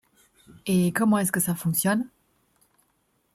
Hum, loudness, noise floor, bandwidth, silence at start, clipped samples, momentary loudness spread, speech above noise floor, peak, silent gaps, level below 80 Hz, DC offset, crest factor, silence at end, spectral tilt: none; -24 LUFS; -70 dBFS; 16.5 kHz; 0.65 s; under 0.1%; 9 LU; 46 dB; -8 dBFS; none; -64 dBFS; under 0.1%; 18 dB; 1.3 s; -5 dB/octave